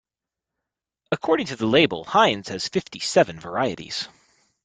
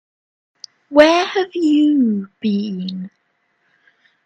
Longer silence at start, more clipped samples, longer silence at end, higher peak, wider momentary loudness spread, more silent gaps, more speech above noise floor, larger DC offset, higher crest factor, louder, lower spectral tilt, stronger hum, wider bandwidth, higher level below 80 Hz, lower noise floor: first, 1.1 s vs 0.9 s; neither; second, 0.6 s vs 1.2 s; second, -4 dBFS vs 0 dBFS; second, 11 LU vs 15 LU; neither; first, 66 dB vs 50 dB; neither; about the same, 20 dB vs 18 dB; second, -22 LUFS vs -16 LUFS; second, -4 dB/octave vs -5.5 dB/octave; neither; first, 9.6 kHz vs 8.4 kHz; about the same, -60 dBFS vs -62 dBFS; first, -88 dBFS vs -66 dBFS